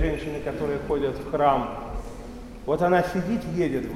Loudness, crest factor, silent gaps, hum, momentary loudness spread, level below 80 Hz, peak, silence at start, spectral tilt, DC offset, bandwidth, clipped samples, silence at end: -25 LUFS; 18 dB; none; none; 15 LU; -38 dBFS; -8 dBFS; 0 s; -7 dB/octave; under 0.1%; 16 kHz; under 0.1%; 0 s